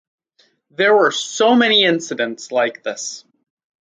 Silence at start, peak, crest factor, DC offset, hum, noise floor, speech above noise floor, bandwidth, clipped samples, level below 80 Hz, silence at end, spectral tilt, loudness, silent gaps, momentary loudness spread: 0.8 s; -2 dBFS; 16 dB; under 0.1%; none; -60 dBFS; 43 dB; 9.4 kHz; under 0.1%; -74 dBFS; 0.7 s; -2.5 dB/octave; -16 LUFS; none; 15 LU